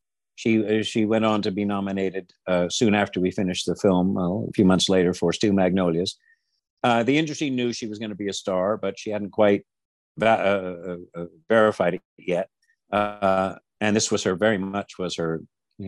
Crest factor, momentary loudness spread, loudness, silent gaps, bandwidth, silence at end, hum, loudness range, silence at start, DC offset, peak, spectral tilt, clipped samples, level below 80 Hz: 18 dB; 10 LU; -23 LUFS; 6.70-6.77 s, 9.85-10.15 s, 12.05-12.17 s; 11.5 kHz; 0 s; none; 3 LU; 0.4 s; under 0.1%; -6 dBFS; -5 dB/octave; under 0.1%; -64 dBFS